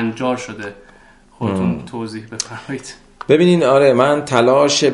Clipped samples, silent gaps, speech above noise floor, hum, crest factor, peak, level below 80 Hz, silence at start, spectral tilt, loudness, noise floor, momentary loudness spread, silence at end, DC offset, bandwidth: under 0.1%; none; 31 dB; none; 16 dB; 0 dBFS; -50 dBFS; 0 s; -5 dB/octave; -15 LUFS; -47 dBFS; 17 LU; 0 s; under 0.1%; 11.5 kHz